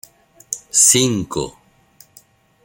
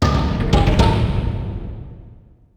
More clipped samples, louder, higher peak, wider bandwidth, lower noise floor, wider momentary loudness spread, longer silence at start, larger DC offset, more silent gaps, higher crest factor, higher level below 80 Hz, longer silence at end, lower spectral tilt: neither; first, -14 LUFS vs -18 LUFS; about the same, 0 dBFS vs -2 dBFS; first, 17 kHz vs 10.5 kHz; first, -51 dBFS vs -44 dBFS; about the same, 18 LU vs 18 LU; first, 0.5 s vs 0 s; neither; neither; about the same, 20 dB vs 16 dB; second, -52 dBFS vs -22 dBFS; first, 1.15 s vs 0.4 s; second, -2.5 dB/octave vs -7 dB/octave